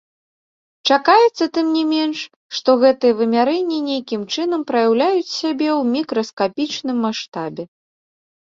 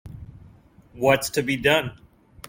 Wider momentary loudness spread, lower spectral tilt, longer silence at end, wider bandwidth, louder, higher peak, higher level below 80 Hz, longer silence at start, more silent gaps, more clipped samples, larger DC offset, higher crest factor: second, 12 LU vs 20 LU; about the same, -4 dB/octave vs -4 dB/octave; first, 0.9 s vs 0 s; second, 7.6 kHz vs 16.5 kHz; first, -18 LUFS vs -22 LUFS; about the same, -2 dBFS vs -4 dBFS; second, -66 dBFS vs -52 dBFS; first, 0.85 s vs 0.05 s; first, 2.36-2.49 s, 6.33-6.37 s, 7.28-7.32 s vs none; neither; neither; about the same, 18 dB vs 22 dB